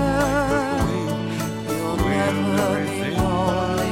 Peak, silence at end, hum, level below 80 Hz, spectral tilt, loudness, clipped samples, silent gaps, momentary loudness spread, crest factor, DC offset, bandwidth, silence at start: -8 dBFS; 0 s; none; -36 dBFS; -5.5 dB/octave; -22 LUFS; under 0.1%; none; 5 LU; 14 dB; under 0.1%; 16.5 kHz; 0 s